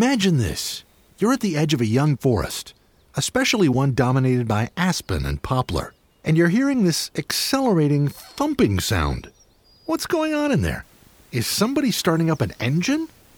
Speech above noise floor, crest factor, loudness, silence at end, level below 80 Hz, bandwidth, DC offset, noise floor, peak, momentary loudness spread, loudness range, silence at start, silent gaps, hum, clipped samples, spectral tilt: 34 dB; 16 dB; -21 LUFS; 0.3 s; -40 dBFS; 19.5 kHz; under 0.1%; -55 dBFS; -6 dBFS; 10 LU; 3 LU; 0 s; none; none; under 0.1%; -5 dB/octave